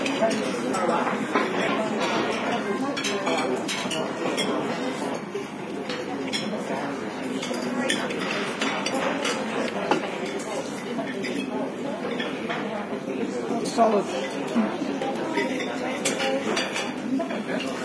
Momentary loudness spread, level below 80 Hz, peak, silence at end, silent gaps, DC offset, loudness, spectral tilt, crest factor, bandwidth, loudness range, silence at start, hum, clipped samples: 6 LU; -70 dBFS; -6 dBFS; 0 s; none; under 0.1%; -27 LUFS; -4 dB/octave; 20 dB; 11 kHz; 4 LU; 0 s; none; under 0.1%